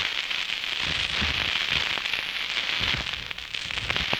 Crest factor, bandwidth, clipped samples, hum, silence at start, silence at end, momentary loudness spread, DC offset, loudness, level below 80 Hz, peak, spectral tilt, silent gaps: 20 dB; over 20 kHz; under 0.1%; none; 0 s; 0 s; 6 LU; under 0.1%; -25 LUFS; -46 dBFS; -8 dBFS; -2 dB/octave; none